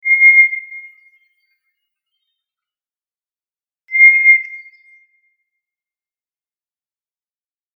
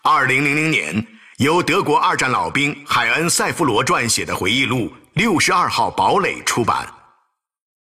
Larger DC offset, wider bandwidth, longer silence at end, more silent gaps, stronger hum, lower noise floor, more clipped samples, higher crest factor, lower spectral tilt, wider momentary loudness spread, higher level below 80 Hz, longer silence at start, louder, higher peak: neither; second, 3.3 kHz vs 16 kHz; first, 3.2 s vs 0.95 s; neither; neither; first, under -90 dBFS vs -65 dBFS; neither; first, 18 dB vs 12 dB; second, 6 dB/octave vs -3.5 dB/octave; first, 21 LU vs 6 LU; second, under -90 dBFS vs -50 dBFS; about the same, 0.05 s vs 0.05 s; first, -8 LUFS vs -17 LUFS; first, 0 dBFS vs -6 dBFS